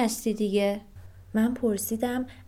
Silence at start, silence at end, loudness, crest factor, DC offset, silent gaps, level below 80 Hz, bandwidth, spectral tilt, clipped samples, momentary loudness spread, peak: 0 s; 0.05 s; -28 LUFS; 16 dB; under 0.1%; none; -56 dBFS; 16.5 kHz; -5 dB/octave; under 0.1%; 5 LU; -12 dBFS